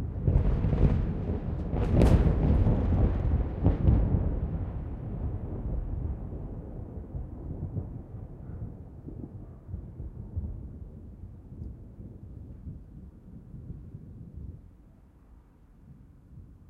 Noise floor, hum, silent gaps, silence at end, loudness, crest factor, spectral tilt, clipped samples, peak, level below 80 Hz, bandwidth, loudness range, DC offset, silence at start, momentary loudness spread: -55 dBFS; none; none; 0.15 s; -30 LUFS; 22 dB; -10 dB/octave; under 0.1%; -8 dBFS; -34 dBFS; 6 kHz; 20 LU; under 0.1%; 0 s; 21 LU